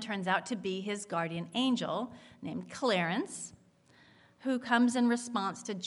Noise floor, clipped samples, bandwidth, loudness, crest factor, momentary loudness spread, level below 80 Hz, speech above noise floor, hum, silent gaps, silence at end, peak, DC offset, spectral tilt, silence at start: -63 dBFS; under 0.1%; 11.5 kHz; -33 LUFS; 20 dB; 14 LU; -78 dBFS; 31 dB; none; none; 0 s; -14 dBFS; under 0.1%; -4.5 dB/octave; 0 s